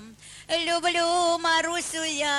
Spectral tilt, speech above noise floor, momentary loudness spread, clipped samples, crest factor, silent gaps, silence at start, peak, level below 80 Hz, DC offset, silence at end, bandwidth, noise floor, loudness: -1 dB/octave; 21 dB; 8 LU; under 0.1%; 14 dB; none; 0 s; -12 dBFS; -62 dBFS; under 0.1%; 0 s; 13 kHz; -46 dBFS; -24 LUFS